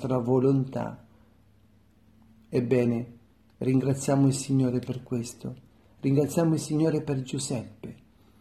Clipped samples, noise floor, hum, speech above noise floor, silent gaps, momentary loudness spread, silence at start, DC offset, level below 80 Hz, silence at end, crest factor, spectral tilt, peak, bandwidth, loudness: under 0.1%; -60 dBFS; none; 34 dB; none; 16 LU; 0 s; under 0.1%; -62 dBFS; 0.45 s; 16 dB; -7 dB/octave; -10 dBFS; 13.5 kHz; -27 LUFS